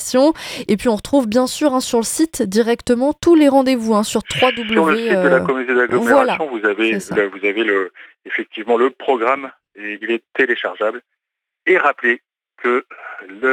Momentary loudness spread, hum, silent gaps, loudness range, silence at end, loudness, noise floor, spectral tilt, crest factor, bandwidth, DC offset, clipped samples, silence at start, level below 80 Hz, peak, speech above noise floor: 10 LU; none; none; 5 LU; 0 s; -17 LUFS; -82 dBFS; -4 dB/octave; 16 dB; 17.5 kHz; under 0.1%; under 0.1%; 0 s; -52 dBFS; -2 dBFS; 65 dB